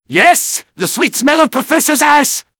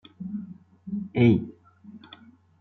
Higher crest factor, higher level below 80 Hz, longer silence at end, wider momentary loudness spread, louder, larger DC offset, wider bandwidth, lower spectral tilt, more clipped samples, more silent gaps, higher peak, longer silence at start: second, 12 dB vs 20 dB; about the same, -58 dBFS vs -62 dBFS; second, 0.2 s vs 0.65 s; second, 8 LU vs 25 LU; first, -11 LUFS vs -26 LUFS; neither; first, over 20 kHz vs 4.3 kHz; second, -2 dB/octave vs -10 dB/octave; first, 0.6% vs under 0.1%; neither; first, 0 dBFS vs -8 dBFS; about the same, 0.1 s vs 0.2 s